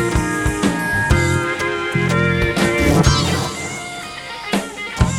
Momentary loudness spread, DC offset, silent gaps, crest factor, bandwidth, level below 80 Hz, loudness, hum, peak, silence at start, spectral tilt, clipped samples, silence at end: 12 LU; under 0.1%; none; 16 dB; 17 kHz; -28 dBFS; -18 LUFS; none; 0 dBFS; 0 s; -5 dB/octave; under 0.1%; 0 s